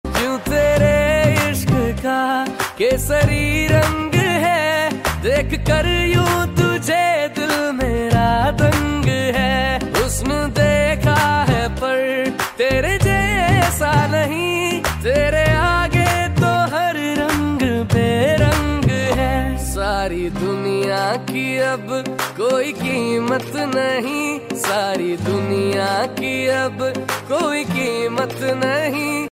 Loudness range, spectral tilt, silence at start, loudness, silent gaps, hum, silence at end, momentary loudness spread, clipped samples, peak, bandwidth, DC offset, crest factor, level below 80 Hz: 3 LU; -5 dB/octave; 0.05 s; -18 LUFS; none; none; 0 s; 6 LU; under 0.1%; -4 dBFS; 16 kHz; under 0.1%; 14 dB; -30 dBFS